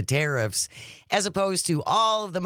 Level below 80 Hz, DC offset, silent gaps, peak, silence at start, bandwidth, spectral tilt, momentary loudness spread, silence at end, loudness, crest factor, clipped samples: -62 dBFS; under 0.1%; none; -6 dBFS; 0 s; 19 kHz; -3.5 dB/octave; 6 LU; 0 s; -24 LUFS; 18 dB; under 0.1%